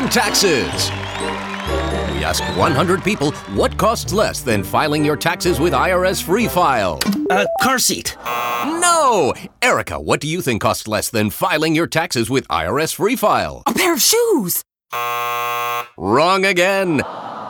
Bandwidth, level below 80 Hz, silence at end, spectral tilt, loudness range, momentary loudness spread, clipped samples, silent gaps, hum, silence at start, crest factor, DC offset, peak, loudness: 19 kHz; -38 dBFS; 0 s; -3.5 dB/octave; 2 LU; 8 LU; under 0.1%; none; none; 0 s; 16 dB; under 0.1%; -2 dBFS; -17 LUFS